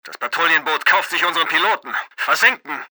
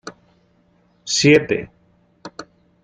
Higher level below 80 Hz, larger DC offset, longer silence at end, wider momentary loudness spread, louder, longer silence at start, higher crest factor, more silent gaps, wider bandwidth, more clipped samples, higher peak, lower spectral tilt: second, -88 dBFS vs -56 dBFS; neither; second, 0.05 s vs 0.4 s; second, 9 LU vs 26 LU; about the same, -17 LUFS vs -16 LUFS; about the same, 0.05 s vs 0.05 s; about the same, 16 dB vs 20 dB; neither; first, over 20 kHz vs 9.6 kHz; neither; about the same, -2 dBFS vs -2 dBFS; second, -0.5 dB/octave vs -4 dB/octave